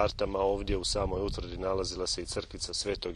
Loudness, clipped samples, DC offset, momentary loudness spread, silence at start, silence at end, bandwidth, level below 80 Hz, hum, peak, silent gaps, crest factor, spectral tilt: -32 LUFS; under 0.1%; under 0.1%; 6 LU; 0 s; 0 s; 12 kHz; -42 dBFS; none; -12 dBFS; none; 20 dB; -4 dB/octave